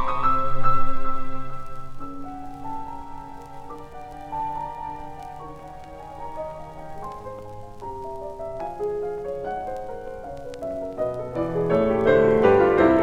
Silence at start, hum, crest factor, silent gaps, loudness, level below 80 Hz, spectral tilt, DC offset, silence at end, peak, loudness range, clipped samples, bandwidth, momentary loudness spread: 0 s; none; 18 dB; none; -25 LUFS; -38 dBFS; -8 dB/octave; under 0.1%; 0 s; -4 dBFS; 13 LU; under 0.1%; 4.9 kHz; 22 LU